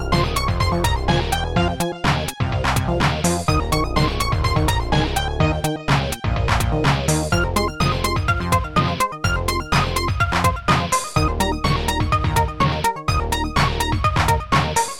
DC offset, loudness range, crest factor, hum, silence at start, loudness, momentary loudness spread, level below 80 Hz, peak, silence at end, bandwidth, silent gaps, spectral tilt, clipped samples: 0.3%; 1 LU; 16 dB; none; 0 s; -20 LUFS; 3 LU; -28 dBFS; -2 dBFS; 0 s; 17 kHz; none; -4.5 dB/octave; under 0.1%